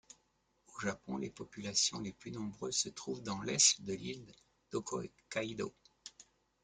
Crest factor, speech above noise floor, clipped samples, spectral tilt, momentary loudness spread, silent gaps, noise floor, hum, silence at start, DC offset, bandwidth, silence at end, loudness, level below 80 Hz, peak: 26 dB; 39 dB; under 0.1%; -2 dB/octave; 20 LU; none; -77 dBFS; none; 0.7 s; under 0.1%; 11 kHz; 0.4 s; -36 LUFS; -72 dBFS; -14 dBFS